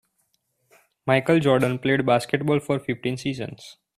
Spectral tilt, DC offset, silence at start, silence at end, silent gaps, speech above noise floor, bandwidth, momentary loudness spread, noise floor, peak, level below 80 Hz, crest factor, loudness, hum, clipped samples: -6.5 dB/octave; under 0.1%; 1.05 s; 0.25 s; none; 49 dB; 14 kHz; 14 LU; -71 dBFS; -4 dBFS; -60 dBFS; 18 dB; -23 LUFS; none; under 0.1%